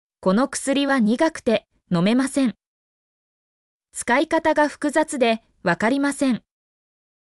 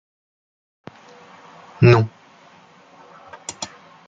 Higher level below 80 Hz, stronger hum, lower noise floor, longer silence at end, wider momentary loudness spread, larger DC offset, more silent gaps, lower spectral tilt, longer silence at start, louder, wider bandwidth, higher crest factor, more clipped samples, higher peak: second, -60 dBFS vs -54 dBFS; neither; first, under -90 dBFS vs -49 dBFS; first, 0.85 s vs 0.4 s; second, 6 LU vs 26 LU; neither; first, 2.66-3.80 s vs none; second, -5 dB/octave vs -6.5 dB/octave; second, 0.2 s vs 1.8 s; second, -21 LUFS vs -17 LUFS; first, 13.5 kHz vs 9.2 kHz; second, 16 dB vs 22 dB; neither; second, -6 dBFS vs -2 dBFS